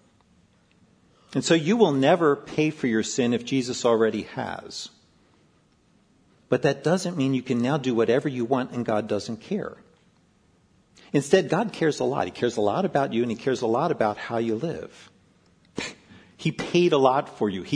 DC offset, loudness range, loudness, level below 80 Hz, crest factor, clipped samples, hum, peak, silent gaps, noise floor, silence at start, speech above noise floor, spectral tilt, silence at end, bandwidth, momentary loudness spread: under 0.1%; 6 LU; -24 LUFS; -66 dBFS; 22 dB; under 0.1%; none; -4 dBFS; none; -62 dBFS; 1.35 s; 38 dB; -5.5 dB/octave; 0 s; 11 kHz; 12 LU